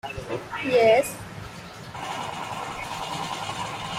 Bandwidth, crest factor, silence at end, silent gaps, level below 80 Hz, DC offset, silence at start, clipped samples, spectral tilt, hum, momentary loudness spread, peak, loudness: 16 kHz; 20 dB; 0 s; none; -54 dBFS; under 0.1%; 0.05 s; under 0.1%; -4 dB/octave; none; 19 LU; -6 dBFS; -26 LUFS